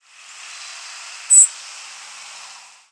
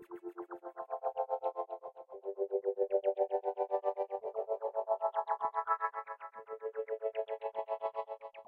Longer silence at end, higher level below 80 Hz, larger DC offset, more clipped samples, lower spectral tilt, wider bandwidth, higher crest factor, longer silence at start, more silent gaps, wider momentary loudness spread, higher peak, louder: first, 1.4 s vs 0.05 s; about the same, under -90 dBFS vs under -90 dBFS; neither; neither; second, 7 dB/octave vs -6 dB/octave; first, 11 kHz vs 4.6 kHz; about the same, 20 dB vs 20 dB; first, 1.3 s vs 0 s; neither; first, 25 LU vs 13 LU; first, -2 dBFS vs -18 dBFS; first, -11 LUFS vs -38 LUFS